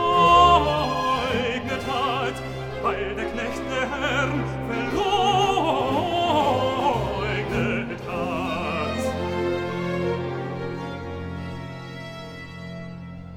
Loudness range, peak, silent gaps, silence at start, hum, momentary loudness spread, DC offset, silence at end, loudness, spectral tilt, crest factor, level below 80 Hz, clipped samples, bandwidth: 7 LU; -4 dBFS; none; 0 s; none; 16 LU; under 0.1%; 0 s; -23 LUFS; -5.5 dB/octave; 20 dB; -42 dBFS; under 0.1%; 17.5 kHz